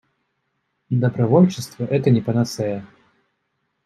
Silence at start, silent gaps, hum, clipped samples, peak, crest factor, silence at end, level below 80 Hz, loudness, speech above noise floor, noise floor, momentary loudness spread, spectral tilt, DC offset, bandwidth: 0.9 s; none; none; under 0.1%; -2 dBFS; 18 dB; 1 s; -62 dBFS; -20 LUFS; 54 dB; -73 dBFS; 11 LU; -7.5 dB/octave; under 0.1%; 13.5 kHz